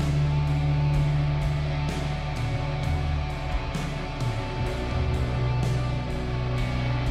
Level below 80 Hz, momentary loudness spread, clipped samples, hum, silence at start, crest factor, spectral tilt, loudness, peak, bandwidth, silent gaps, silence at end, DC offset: -32 dBFS; 6 LU; under 0.1%; none; 0 s; 10 dB; -7 dB/octave; -27 LUFS; -16 dBFS; 11 kHz; none; 0 s; under 0.1%